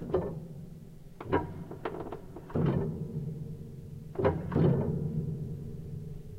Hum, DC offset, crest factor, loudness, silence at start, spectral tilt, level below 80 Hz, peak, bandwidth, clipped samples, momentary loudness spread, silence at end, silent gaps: none; under 0.1%; 20 dB; -34 LUFS; 0 s; -9.5 dB/octave; -50 dBFS; -14 dBFS; 8.2 kHz; under 0.1%; 17 LU; 0 s; none